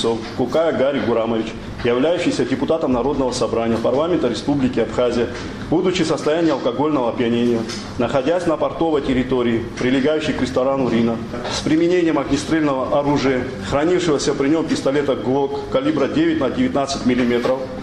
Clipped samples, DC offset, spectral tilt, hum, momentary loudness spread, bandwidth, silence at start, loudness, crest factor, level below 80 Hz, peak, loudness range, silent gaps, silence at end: under 0.1%; 0.1%; -5.5 dB/octave; none; 4 LU; 11.5 kHz; 0 s; -19 LUFS; 14 dB; -42 dBFS; -4 dBFS; 1 LU; none; 0 s